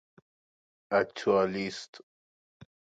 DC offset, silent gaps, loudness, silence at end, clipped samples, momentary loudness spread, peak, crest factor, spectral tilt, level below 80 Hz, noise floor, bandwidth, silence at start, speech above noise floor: under 0.1%; 1.88-1.93 s, 2.03-2.60 s; -29 LUFS; 0.25 s; under 0.1%; 15 LU; -14 dBFS; 20 dB; -5 dB/octave; -70 dBFS; under -90 dBFS; 9 kHz; 0.9 s; over 61 dB